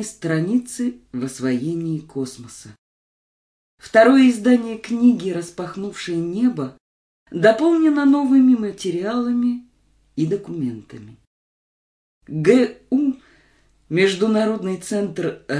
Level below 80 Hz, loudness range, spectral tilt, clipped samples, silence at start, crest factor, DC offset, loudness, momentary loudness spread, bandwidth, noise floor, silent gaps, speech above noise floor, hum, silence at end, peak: -62 dBFS; 8 LU; -6 dB/octave; under 0.1%; 0 s; 20 dB; under 0.1%; -19 LUFS; 15 LU; 11 kHz; -59 dBFS; 2.78-3.78 s, 6.80-7.26 s, 11.27-12.21 s; 40 dB; none; 0 s; 0 dBFS